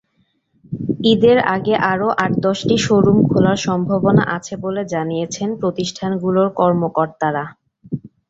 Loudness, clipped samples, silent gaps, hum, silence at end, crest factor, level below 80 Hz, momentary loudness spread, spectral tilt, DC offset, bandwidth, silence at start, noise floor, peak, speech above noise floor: -17 LUFS; under 0.1%; none; none; 0.25 s; 16 dB; -50 dBFS; 11 LU; -6 dB/octave; under 0.1%; 8 kHz; 0.7 s; -64 dBFS; -2 dBFS; 48 dB